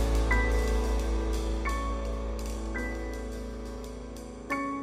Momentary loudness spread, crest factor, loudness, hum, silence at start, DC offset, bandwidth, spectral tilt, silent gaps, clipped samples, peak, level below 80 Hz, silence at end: 14 LU; 16 dB; -32 LUFS; none; 0 s; under 0.1%; 14 kHz; -5.5 dB/octave; none; under 0.1%; -14 dBFS; -32 dBFS; 0 s